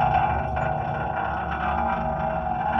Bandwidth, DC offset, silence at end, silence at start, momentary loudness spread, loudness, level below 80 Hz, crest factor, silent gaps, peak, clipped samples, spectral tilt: 6 kHz; under 0.1%; 0 s; 0 s; 4 LU; -26 LUFS; -38 dBFS; 14 dB; none; -10 dBFS; under 0.1%; -8.5 dB/octave